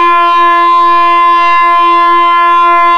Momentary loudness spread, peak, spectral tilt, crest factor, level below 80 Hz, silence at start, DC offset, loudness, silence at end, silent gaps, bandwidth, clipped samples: 0 LU; -2 dBFS; -2.5 dB/octave; 4 dB; -52 dBFS; 0 s; under 0.1%; -6 LUFS; 0 s; none; 7 kHz; under 0.1%